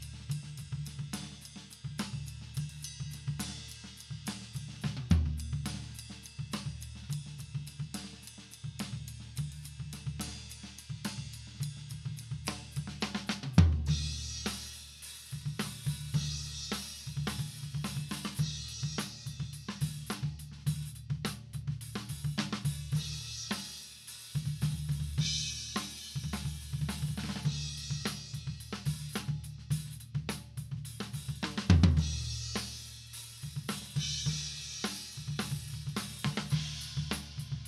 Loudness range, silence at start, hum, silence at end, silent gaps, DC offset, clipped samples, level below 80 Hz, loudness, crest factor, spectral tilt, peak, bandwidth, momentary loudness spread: 9 LU; 0 s; none; 0 s; none; under 0.1%; under 0.1%; -46 dBFS; -37 LUFS; 28 dB; -4.5 dB/octave; -8 dBFS; 14.5 kHz; 11 LU